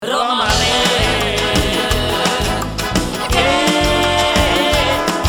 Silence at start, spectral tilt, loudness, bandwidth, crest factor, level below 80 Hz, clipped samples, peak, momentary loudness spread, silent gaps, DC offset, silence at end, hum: 0 s; -3.5 dB/octave; -15 LUFS; 19.5 kHz; 14 dB; -26 dBFS; under 0.1%; 0 dBFS; 5 LU; none; under 0.1%; 0 s; none